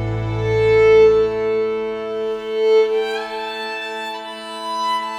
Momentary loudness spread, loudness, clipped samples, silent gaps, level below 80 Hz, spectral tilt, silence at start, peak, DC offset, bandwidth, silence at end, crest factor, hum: 14 LU; -18 LUFS; under 0.1%; none; -42 dBFS; -5.5 dB/octave; 0 s; -4 dBFS; under 0.1%; 10.5 kHz; 0 s; 14 dB; 50 Hz at -65 dBFS